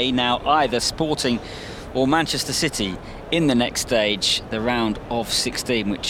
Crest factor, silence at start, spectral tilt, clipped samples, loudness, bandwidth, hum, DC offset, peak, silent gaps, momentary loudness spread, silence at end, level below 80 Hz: 18 dB; 0 s; -3.5 dB/octave; under 0.1%; -21 LUFS; 17 kHz; none; under 0.1%; -4 dBFS; none; 8 LU; 0 s; -42 dBFS